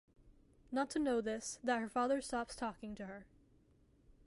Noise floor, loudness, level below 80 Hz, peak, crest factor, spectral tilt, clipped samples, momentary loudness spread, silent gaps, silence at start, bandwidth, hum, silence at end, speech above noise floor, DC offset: -70 dBFS; -39 LUFS; -66 dBFS; -24 dBFS; 16 dB; -4 dB/octave; under 0.1%; 12 LU; none; 0.25 s; 11.5 kHz; none; 0.15 s; 31 dB; under 0.1%